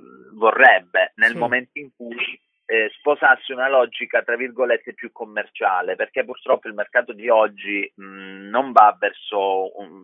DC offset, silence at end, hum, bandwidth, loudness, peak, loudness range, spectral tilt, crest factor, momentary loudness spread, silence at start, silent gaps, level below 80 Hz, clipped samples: under 0.1%; 0.05 s; none; 10.5 kHz; -19 LUFS; 0 dBFS; 4 LU; -5 dB/octave; 20 dB; 17 LU; 0.35 s; none; -80 dBFS; under 0.1%